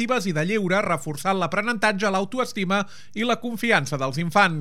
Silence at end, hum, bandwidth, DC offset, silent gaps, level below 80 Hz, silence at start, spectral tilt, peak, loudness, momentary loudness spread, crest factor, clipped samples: 0 s; none; 16 kHz; 1%; none; -68 dBFS; 0 s; -5 dB/octave; -4 dBFS; -23 LUFS; 5 LU; 20 dB; under 0.1%